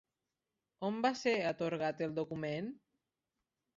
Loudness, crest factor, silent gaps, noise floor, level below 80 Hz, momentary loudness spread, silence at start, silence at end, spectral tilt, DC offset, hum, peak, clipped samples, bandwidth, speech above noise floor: -37 LUFS; 20 dB; none; -90 dBFS; -78 dBFS; 8 LU; 0.8 s; 1 s; -4 dB/octave; under 0.1%; none; -20 dBFS; under 0.1%; 7.4 kHz; 54 dB